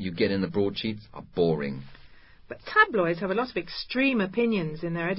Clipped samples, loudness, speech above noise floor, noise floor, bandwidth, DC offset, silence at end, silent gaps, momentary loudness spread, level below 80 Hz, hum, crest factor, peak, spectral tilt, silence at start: under 0.1%; -26 LUFS; 23 dB; -50 dBFS; 5.8 kHz; under 0.1%; 0 s; none; 14 LU; -56 dBFS; none; 20 dB; -8 dBFS; -10 dB/octave; 0 s